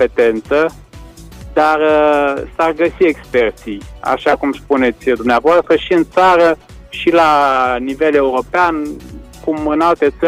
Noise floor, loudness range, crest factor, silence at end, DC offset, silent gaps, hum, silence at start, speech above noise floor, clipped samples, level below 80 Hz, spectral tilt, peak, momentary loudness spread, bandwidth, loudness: -35 dBFS; 3 LU; 12 dB; 0 s; under 0.1%; none; none; 0 s; 22 dB; under 0.1%; -38 dBFS; -5.5 dB/octave; -2 dBFS; 11 LU; 15 kHz; -14 LUFS